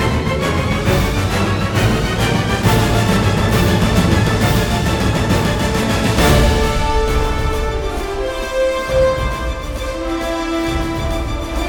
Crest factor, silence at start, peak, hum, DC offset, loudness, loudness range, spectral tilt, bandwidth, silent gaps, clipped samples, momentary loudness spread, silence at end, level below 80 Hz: 14 dB; 0 s; 0 dBFS; none; under 0.1%; -16 LUFS; 4 LU; -5.5 dB/octave; 19 kHz; none; under 0.1%; 8 LU; 0 s; -22 dBFS